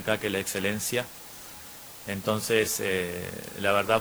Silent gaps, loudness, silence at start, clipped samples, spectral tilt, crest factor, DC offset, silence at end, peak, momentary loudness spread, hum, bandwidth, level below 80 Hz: none; -28 LUFS; 0 s; under 0.1%; -3.5 dB/octave; 20 dB; under 0.1%; 0 s; -8 dBFS; 17 LU; none; over 20 kHz; -60 dBFS